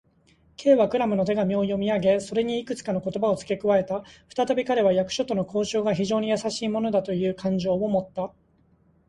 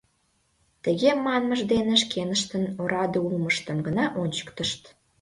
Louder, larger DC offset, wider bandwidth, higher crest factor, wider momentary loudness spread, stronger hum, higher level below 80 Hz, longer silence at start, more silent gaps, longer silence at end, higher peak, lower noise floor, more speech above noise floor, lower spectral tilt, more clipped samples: about the same, -25 LUFS vs -25 LUFS; neither; about the same, 11.5 kHz vs 11.5 kHz; about the same, 18 dB vs 18 dB; about the same, 7 LU vs 8 LU; neither; about the same, -58 dBFS vs -58 dBFS; second, 0.6 s vs 0.85 s; neither; first, 0.8 s vs 0.35 s; about the same, -6 dBFS vs -8 dBFS; second, -62 dBFS vs -69 dBFS; second, 38 dB vs 44 dB; first, -6 dB/octave vs -4.5 dB/octave; neither